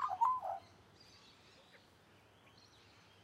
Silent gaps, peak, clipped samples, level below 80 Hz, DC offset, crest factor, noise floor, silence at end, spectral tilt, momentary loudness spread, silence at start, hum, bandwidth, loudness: none; -22 dBFS; under 0.1%; -80 dBFS; under 0.1%; 20 dB; -66 dBFS; 2.6 s; -3.5 dB/octave; 28 LU; 0 s; none; 14.5 kHz; -38 LUFS